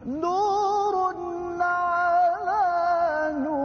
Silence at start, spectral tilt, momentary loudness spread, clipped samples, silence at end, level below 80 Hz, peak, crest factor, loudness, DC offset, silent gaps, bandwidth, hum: 0 s; -5 dB/octave; 5 LU; under 0.1%; 0 s; -58 dBFS; -14 dBFS; 10 dB; -24 LUFS; under 0.1%; none; 6.8 kHz; none